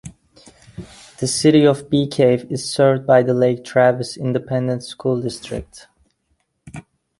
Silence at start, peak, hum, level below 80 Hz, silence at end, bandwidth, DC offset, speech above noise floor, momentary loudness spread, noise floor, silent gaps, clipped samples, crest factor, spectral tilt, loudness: 0.05 s; -2 dBFS; none; -50 dBFS; 0.4 s; 11.5 kHz; under 0.1%; 51 dB; 24 LU; -68 dBFS; none; under 0.1%; 16 dB; -5.5 dB/octave; -17 LUFS